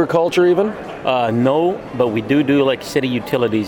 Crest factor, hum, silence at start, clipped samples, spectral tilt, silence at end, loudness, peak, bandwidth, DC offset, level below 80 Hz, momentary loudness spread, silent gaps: 14 dB; none; 0 s; under 0.1%; -6.5 dB/octave; 0 s; -17 LUFS; -2 dBFS; 18.5 kHz; under 0.1%; -52 dBFS; 6 LU; none